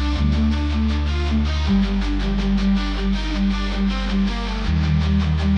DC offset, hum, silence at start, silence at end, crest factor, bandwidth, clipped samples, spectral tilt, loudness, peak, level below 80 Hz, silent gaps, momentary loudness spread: under 0.1%; none; 0 s; 0 s; 10 dB; 8 kHz; under 0.1%; -7 dB/octave; -21 LUFS; -8 dBFS; -24 dBFS; none; 3 LU